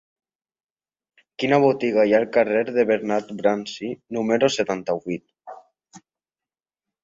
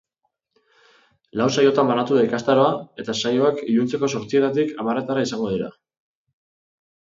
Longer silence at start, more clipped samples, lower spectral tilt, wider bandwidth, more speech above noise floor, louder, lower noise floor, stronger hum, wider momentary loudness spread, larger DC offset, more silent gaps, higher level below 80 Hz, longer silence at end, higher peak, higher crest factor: about the same, 1.4 s vs 1.35 s; neither; about the same, -5.5 dB/octave vs -5.5 dB/octave; about the same, 7.8 kHz vs 7.8 kHz; first, over 69 dB vs 55 dB; about the same, -21 LUFS vs -21 LUFS; first, under -90 dBFS vs -75 dBFS; neither; about the same, 11 LU vs 9 LU; neither; neither; about the same, -66 dBFS vs -62 dBFS; second, 1.05 s vs 1.3 s; about the same, -4 dBFS vs -4 dBFS; about the same, 20 dB vs 18 dB